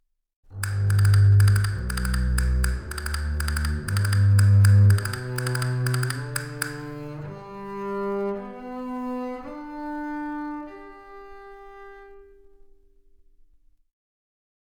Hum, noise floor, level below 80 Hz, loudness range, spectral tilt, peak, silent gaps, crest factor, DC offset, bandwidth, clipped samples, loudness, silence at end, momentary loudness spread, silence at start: none; -57 dBFS; -34 dBFS; 15 LU; -6 dB/octave; -6 dBFS; none; 18 dB; under 0.1%; over 20 kHz; under 0.1%; -23 LUFS; 2.55 s; 26 LU; 0.5 s